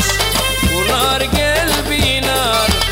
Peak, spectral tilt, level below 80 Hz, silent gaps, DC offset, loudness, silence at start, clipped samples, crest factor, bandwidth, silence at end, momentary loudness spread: -6 dBFS; -3 dB/octave; -24 dBFS; none; under 0.1%; -14 LUFS; 0 s; under 0.1%; 10 dB; 16.5 kHz; 0 s; 1 LU